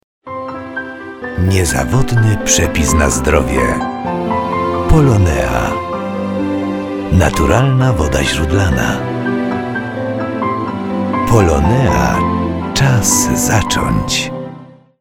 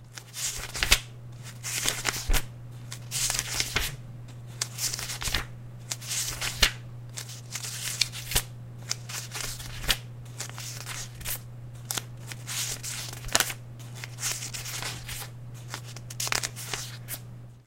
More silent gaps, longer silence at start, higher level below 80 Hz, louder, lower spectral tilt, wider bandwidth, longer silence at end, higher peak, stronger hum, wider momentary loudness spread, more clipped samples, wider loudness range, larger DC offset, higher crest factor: neither; first, 0.25 s vs 0 s; first, -24 dBFS vs -40 dBFS; first, -14 LUFS vs -30 LUFS; first, -5 dB/octave vs -1.5 dB/octave; about the same, 17 kHz vs 17 kHz; first, 0.35 s vs 0.05 s; about the same, 0 dBFS vs 0 dBFS; neither; second, 9 LU vs 16 LU; neither; about the same, 2 LU vs 4 LU; neither; second, 14 dB vs 32 dB